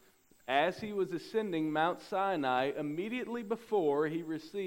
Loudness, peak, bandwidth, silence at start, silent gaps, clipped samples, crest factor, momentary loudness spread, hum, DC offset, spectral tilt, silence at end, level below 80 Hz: -34 LUFS; -14 dBFS; 16 kHz; 0.5 s; none; under 0.1%; 20 dB; 7 LU; none; under 0.1%; -6 dB/octave; 0 s; -74 dBFS